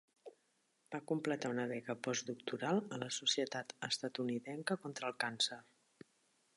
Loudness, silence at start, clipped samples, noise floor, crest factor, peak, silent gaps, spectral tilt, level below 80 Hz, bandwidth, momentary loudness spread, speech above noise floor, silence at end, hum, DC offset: -39 LUFS; 0.25 s; under 0.1%; -79 dBFS; 20 dB; -22 dBFS; none; -3.5 dB/octave; -88 dBFS; 11.5 kHz; 12 LU; 39 dB; 0.95 s; none; under 0.1%